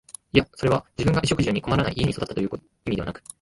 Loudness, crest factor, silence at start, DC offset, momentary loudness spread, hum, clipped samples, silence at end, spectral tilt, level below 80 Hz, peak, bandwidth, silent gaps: -24 LUFS; 22 dB; 0.35 s; under 0.1%; 8 LU; none; under 0.1%; 0.25 s; -6 dB/octave; -42 dBFS; -2 dBFS; 11.5 kHz; none